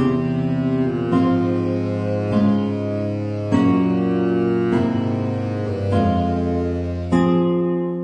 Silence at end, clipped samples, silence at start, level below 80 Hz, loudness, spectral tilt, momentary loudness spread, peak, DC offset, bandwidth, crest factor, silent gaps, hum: 0 s; under 0.1%; 0 s; -44 dBFS; -20 LUFS; -9 dB/octave; 6 LU; -6 dBFS; under 0.1%; 9.2 kHz; 14 dB; none; none